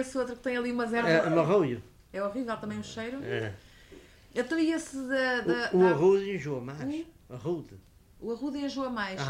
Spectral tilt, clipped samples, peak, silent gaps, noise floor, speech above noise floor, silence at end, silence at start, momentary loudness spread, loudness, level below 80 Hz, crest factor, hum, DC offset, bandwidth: -6 dB/octave; under 0.1%; -12 dBFS; none; -53 dBFS; 24 dB; 0 s; 0 s; 14 LU; -30 LUFS; -60 dBFS; 18 dB; none; under 0.1%; 12.5 kHz